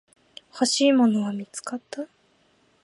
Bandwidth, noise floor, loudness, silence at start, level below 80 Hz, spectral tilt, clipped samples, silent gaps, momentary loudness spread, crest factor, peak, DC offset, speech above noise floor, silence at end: 11.5 kHz; -63 dBFS; -23 LUFS; 0.55 s; -78 dBFS; -4 dB/octave; under 0.1%; none; 19 LU; 18 dB; -8 dBFS; under 0.1%; 40 dB; 0.8 s